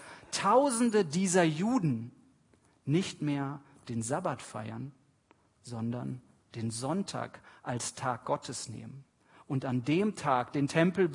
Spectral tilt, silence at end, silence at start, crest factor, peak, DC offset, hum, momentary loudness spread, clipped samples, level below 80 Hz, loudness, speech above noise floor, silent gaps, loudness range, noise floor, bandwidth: -5.5 dB/octave; 0 s; 0 s; 22 dB; -10 dBFS; under 0.1%; none; 17 LU; under 0.1%; -72 dBFS; -32 LUFS; 36 dB; none; 9 LU; -67 dBFS; 11 kHz